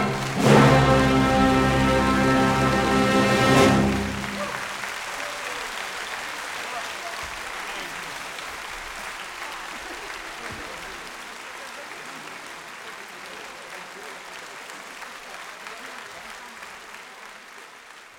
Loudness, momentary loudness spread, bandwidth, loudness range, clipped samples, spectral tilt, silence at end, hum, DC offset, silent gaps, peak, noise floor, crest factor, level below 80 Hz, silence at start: -23 LUFS; 20 LU; 17.5 kHz; 18 LU; under 0.1%; -5 dB/octave; 0 s; none; under 0.1%; none; -2 dBFS; -45 dBFS; 22 dB; -42 dBFS; 0 s